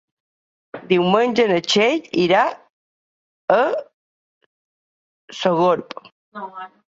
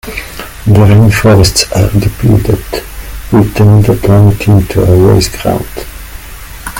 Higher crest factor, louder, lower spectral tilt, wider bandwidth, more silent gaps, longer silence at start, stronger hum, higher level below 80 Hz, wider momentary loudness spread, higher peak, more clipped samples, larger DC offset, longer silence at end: first, 20 dB vs 8 dB; second, -18 LUFS vs -8 LUFS; about the same, -5 dB/octave vs -6 dB/octave; second, 7.8 kHz vs 17 kHz; first, 2.70-3.48 s, 3.94-5.28 s, 6.12-6.32 s vs none; first, 0.75 s vs 0.05 s; neither; second, -66 dBFS vs -24 dBFS; about the same, 21 LU vs 19 LU; about the same, -2 dBFS vs 0 dBFS; second, under 0.1% vs 1%; neither; first, 0.25 s vs 0 s